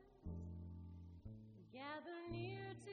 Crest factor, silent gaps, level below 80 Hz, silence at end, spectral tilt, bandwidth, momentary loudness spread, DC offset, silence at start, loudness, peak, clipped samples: 16 dB; none; -64 dBFS; 0 s; -5.5 dB/octave; 7 kHz; 10 LU; under 0.1%; 0 s; -53 LUFS; -36 dBFS; under 0.1%